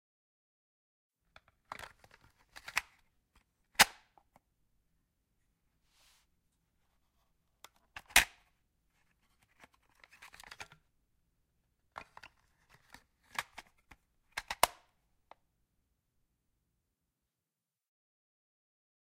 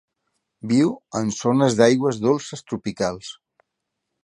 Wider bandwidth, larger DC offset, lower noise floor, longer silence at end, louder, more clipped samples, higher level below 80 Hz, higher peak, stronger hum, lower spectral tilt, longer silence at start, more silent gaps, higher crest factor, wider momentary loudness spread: first, 16 kHz vs 10.5 kHz; neither; first, under -90 dBFS vs -80 dBFS; first, 4.35 s vs 0.9 s; second, -32 LUFS vs -21 LUFS; neither; second, -64 dBFS vs -58 dBFS; second, -6 dBFS vs -2 dBFS; neither; second, 0.5 dB/octave vs -5.5 dB/octave; first, 1.8 s vs 0.65 s; neither; first, 36 dB vs 22 dB; first, 27 LU vs 15 LU